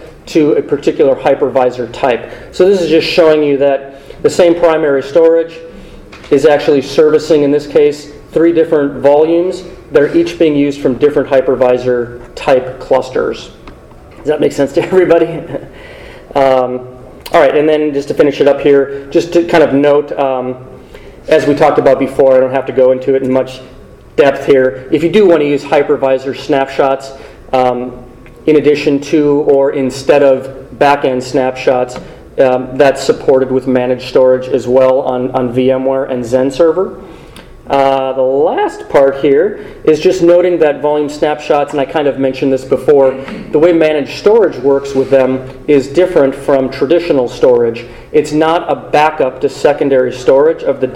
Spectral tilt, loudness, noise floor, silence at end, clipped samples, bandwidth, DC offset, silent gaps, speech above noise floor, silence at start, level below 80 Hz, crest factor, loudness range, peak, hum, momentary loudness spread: -6 dB/octave; -11 LUFS; -35 dBFS; 0 s; 0.5%; 12.5 kHz; under 0.1%; none; 24 dB; 0 s; -40 dBFS; 10 dB; 3 LU; 0 dBFS; none; 9 LU